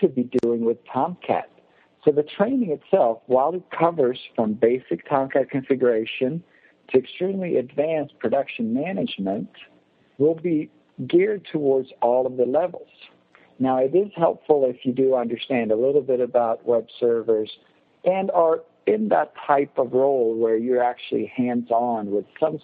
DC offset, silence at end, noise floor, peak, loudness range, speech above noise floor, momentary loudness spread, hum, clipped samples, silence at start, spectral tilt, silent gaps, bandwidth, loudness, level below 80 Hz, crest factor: under 0.1%; 0.05 s; -57 dBFS; -2 dBFS; 3 LU; 36 dB; 6 LU; none; under 0.1%; 0 s; -9 dB/octave; none; 4.8 kHz; -22 LUFS; -72 dBFS; 20 dB